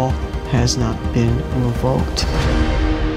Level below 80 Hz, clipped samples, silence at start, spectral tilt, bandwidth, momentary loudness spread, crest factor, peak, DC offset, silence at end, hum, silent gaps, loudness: -22 dBFS; under 0.1%; 0 s; -5.5 dB/octave; 14.5 kHz; 3 LU; 14 dB; -4 dBFS; under 0.1%; 0 s; none; none; -19 LUFS